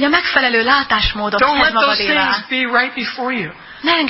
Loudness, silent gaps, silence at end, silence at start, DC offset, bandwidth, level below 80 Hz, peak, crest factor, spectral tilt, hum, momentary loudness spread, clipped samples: -14 LUFS; none; 0 s; 0 s; under 0.1%; 5.8 kHz; -36 dBFS; 0 dBFS; 16 dB; -7 dB/octave; none; 9 LU; under 0.1%